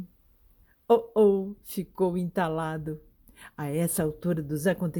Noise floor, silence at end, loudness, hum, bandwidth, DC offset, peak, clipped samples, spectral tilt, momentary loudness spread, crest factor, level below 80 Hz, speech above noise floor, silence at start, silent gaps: -61 dBFS; 0 s; -27 LUFS; none; 19.5 kHz; under 0.1%; -10 dBFS; under 0.1%; -6.5 dB/octave; 15 LU; 18 dB; -56 dBFS; 34 dB; 0 s; none